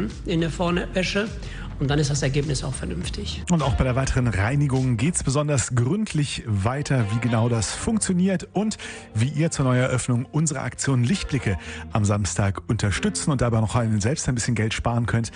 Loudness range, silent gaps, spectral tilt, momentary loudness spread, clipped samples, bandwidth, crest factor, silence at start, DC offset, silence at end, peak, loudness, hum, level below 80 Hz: 2 LU; none; -5.5 dB/octave; 6 LU; under 0.1%; 10.5 kHz; 14 dB; 0 s; under 0.1%; 0 s; -8 dBFS; -23 LUFS; none; -38 dBFS